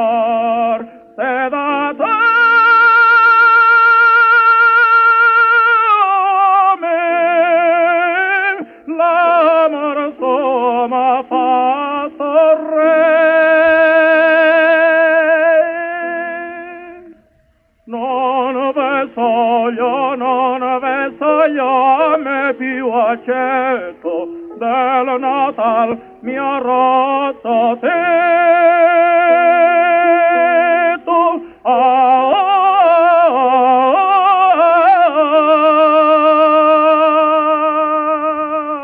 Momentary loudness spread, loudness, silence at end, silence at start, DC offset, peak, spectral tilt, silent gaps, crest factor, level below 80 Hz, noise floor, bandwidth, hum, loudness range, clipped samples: 10 LU; -12 LUFS; 0 s; 0 s; under 0.1%; -2 dBFS; -6 dB/octave; none; 10 dB; -62 dBFS; -56 dBFS; 5.4 kHz; none; 8 LU; under 0.1%